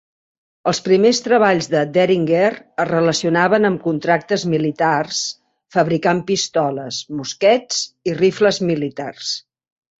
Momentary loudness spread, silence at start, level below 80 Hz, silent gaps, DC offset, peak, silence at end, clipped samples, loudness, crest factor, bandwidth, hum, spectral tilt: 10 LU; 0.65 s; -60 dBFS; none; under 0.1%; -2 dBFS; 0.6 s; under 0.1%; -18 LUFS; 16 dB; 8 kHz; none; -4.5 dB/octave